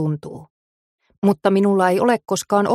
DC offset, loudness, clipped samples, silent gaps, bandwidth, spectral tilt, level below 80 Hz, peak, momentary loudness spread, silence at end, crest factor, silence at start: under 0.1%; -18 LUFS; under 0.1%; 0.50-0.98 s, 1.18-1.22 s; 15 kHz; -6 dB/octave; -64 dBFS; -2 dBFS; 10 LU; 0 s; 16 dB; 0 s